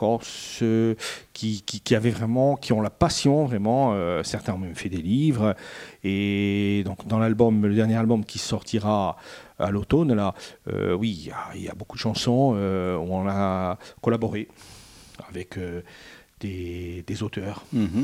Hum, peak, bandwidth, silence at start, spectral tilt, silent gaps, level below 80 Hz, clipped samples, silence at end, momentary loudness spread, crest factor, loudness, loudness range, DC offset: none; -4 dBFS; 15 kHz; 0 s; -6.5 dB/octave; none; -52 dBFS; under 0.1%; 0 s; 14 LU; 20 dB; -25 LUFS; 8 LU; under 0.1%